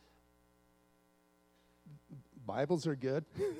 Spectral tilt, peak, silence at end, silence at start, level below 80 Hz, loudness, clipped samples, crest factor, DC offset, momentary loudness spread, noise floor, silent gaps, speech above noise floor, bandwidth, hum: -7 dB/octave; -20 dBFS; 0 s; 1.85 s; -74 dBFS; -37 LUFS; under 0.1%; 20 dB; under 0.1%; 21 LU; -71 dBFS; none; 34 dB; 14 kHz; 60 Hz at -70 dBFS